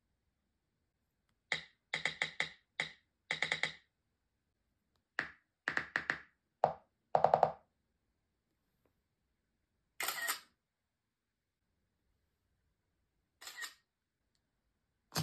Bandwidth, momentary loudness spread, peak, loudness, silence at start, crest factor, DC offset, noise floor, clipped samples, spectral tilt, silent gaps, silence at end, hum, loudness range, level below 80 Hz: 13.5 kHz; 14 LU; -12 dBFS; -38 LUFS; 1.5 s; 32 dB; under 0.1%; -89 dBFS; under 0.1%; -2.5 dB/octave; none; 0 s; none; 18 LU; -78 dBFS